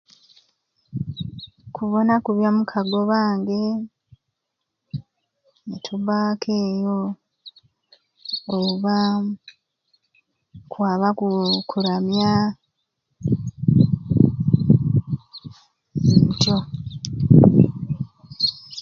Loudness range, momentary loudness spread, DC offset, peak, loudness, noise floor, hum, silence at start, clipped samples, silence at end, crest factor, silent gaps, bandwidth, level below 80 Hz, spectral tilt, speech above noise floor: 8 LU; 19 LU; under 0.1%; 0 dBFS; -20 LUFS; -80 dBFS; none; 0.95 s; under 0.1%; 0 s; 22 dB; none; 7.2 kHz; -46 dBFS; -7 dB/octave; 59 dB